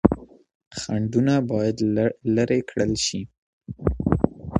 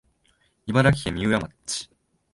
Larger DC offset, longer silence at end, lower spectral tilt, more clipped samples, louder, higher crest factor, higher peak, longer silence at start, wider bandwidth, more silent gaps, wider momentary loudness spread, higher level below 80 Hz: neither; second, 0 s vs 0.5 s; about the same, -6 dB/octave vs -5 dB/octave; neither; about the same, -23 LUFS vs -24 LUFS; about the same, 22 dB vs 20 dB; first, 0 dBFS vs -6 dBFS; second, 0.05 s vs 0.65 s; about the same, 11 kHz vs 11.5 kHz; first, 0.55-0.60 s, 0.67-0.71 s, 3.38-3.61 s vs none; about the same, 13 LU vs 15 LU; first, -40 dBFS vs -46 dBFS